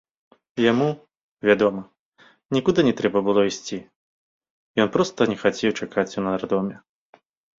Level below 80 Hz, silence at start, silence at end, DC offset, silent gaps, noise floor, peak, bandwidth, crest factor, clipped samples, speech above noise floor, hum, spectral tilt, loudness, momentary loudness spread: -60 dBFS; 0.55 s; 0.85 s; under 0.1%; 1.21-1.37 s, 1.99-2.12 s, 3.96-4.41 s, 4.50-4.74 s; -57 dBFS; -4 dBFS; 7.8 kHz; 20 dB; under 0.1%; 35 dB; none; -5.5 dB/octave; -22 LUFS; 12 LU